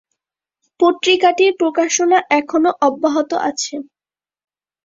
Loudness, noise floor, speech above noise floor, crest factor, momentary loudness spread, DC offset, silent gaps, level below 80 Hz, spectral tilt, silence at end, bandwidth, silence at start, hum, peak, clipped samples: -15 LUFS; under -90 dBFS; over 75 dB; 16 dB; 7 LU; under 0.1%; none; -66 dBFS; -1.5 dB/octave; 1 s; 7.8 kHz; 0.8 s; none; -2 dBFS; under 0.1%